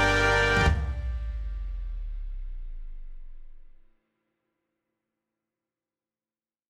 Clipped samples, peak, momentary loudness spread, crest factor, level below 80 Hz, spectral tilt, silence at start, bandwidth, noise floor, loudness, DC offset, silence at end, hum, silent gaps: under 0.1%; -10 dBFS; 24 LU; 20 dB; -34 dBFS; -4.5 dB/octave; 0 s; 13 kHz; under -90 dBFS; -26 LUFS; under 0.1%; 3 s; none; none